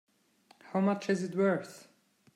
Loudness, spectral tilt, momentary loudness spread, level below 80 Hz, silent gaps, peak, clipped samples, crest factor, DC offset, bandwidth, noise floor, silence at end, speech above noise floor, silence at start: -31 LUFS; -7 dB/octave; 7 LU; -82 dBFS; none; -18 dBFS; under 0.1%; 16 dB; under 0.1%; 12 kHz; -66 dBFS; 0.55 s; 35 dB; 0.65 s